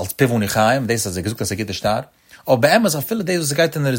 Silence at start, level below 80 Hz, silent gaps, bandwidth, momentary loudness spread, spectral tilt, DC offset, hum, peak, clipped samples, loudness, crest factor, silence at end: 0 s; -50 dBFS; none; 16.5 kHz; 9 LU; -4.5 dB/octave; under 0.1%; none; -2 dBFS; under 0.1%; -18 LUFS; 18 dB; 0 s